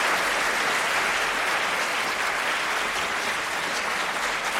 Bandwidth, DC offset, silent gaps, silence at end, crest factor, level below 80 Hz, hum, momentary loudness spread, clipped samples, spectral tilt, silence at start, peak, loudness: 16.5 kHz; under 0.1%; none; 0 s; 14 dB; -56 dBFS; none; 3 LU; under 0.1%; -0.5 dB/octave; 0 s; -12 dBFS; -24 LUFS